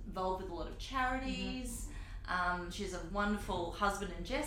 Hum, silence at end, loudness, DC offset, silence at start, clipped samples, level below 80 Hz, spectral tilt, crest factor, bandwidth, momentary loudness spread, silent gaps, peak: none; 0 s; -38 LUFS; under 0.1%; 0 s; under 0.1%; -46 dBFS; -4.5 dB/octave; 18 dB; 16.5 kHz; 9 LU; none; -20 dBFS